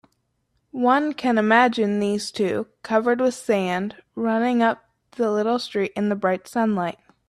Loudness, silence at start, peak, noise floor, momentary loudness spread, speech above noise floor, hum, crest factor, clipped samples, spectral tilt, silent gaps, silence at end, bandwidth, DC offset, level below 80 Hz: -22 LUFS; 0.75 s; -4 dBFS; -71 dBFS; 9 LU; 50 dB; none; 18 dB; under 0.1%; -5.5 dB/octave; none; 0.35 s; 13 kHz; under 0.1%; -66 dBFS